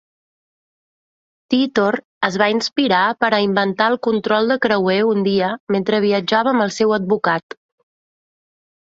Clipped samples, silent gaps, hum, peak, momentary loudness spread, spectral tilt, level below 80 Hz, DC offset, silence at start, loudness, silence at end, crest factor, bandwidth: under 0.1%; 2.05-2.21 s, 5.60-5.67 s; none; -2 dBFS; 4 LU; -5 dB/octave; -62 dBFS; under 0.1%; 1.5 s; -17 LUFS; 1.5 s; 16 dB; 7.8 kHz